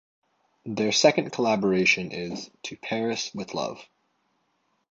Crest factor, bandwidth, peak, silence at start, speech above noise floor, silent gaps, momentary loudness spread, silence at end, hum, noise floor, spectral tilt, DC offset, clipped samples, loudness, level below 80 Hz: 22 dB; 8 kHz; -4 dBFS; 0.65 s; 47 dB; none; 16 LU; 1.1 s; none; -72 dBFS; -3.5 dB/octave; under 0.1%; under 0.1%; -25 LUFS; -66 dBFS